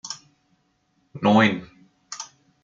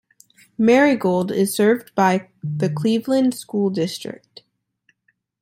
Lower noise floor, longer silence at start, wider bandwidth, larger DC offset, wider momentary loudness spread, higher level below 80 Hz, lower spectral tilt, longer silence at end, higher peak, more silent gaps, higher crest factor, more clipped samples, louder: about the same, -68 dBFS vs -68 dBFS; second, 0.05 s vs 0.6 s; second, 7.6 kHz vs 16.5 kHz; neither; first, 21 LU vs 14 LU; about the same, -66 dBFS vs -66 dBFS; about the same, -5 dB/octave vs -6 dB/octave; second, 0.4 s vs 1.25 s; about the same, -4 dBFS vs -4 dBFS; neither; about the same, 22 dB vs 18 dB; neither; about the same, -20 LUFS vs -19 LUFS